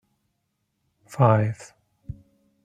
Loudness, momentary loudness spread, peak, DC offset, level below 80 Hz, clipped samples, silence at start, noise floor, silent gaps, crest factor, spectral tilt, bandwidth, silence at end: -21 LUFS; 23 LU; -4 dBFS; under 0.1%; -56 dBFS; under 0.1%; 1.1 s; -76 dBFS; none; 24 dB; -8.5 dB/octave; 10 kHz; 0.5 s